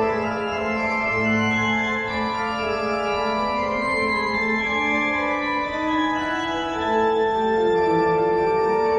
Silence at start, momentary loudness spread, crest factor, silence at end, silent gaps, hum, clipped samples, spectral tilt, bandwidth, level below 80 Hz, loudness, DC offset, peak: 0 s; 5 LU; 14 dB; 0 s; none; none; under 0.1%; -5.5 dB/octave; 10 kHz; -48 dBFS; -22 LUFS; under 0.1%; -8 dBFS